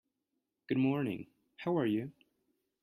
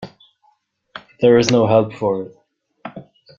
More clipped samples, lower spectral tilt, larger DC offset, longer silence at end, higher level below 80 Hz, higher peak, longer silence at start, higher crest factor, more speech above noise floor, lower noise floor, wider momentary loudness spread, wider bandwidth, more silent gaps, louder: neither; first, -9 dB/octave vs -6 dB/octave; neither; first, 0.7 s vs 0.35 s; second, -74 dBFS vs -56 dBFS; second, -20 dBFS vs -2 dBFS; first, 0.7 s vs 0 s; about the same, 16 dB vs 18 dB; first, 53 dB vs 47 dB; first, -86 dBFS vs -62 dBFS; second, 14 LU vs 25 LU; first, 14 kHz vs 7.8 kHz; neither; second, -35 LUFS vs -16 LUFS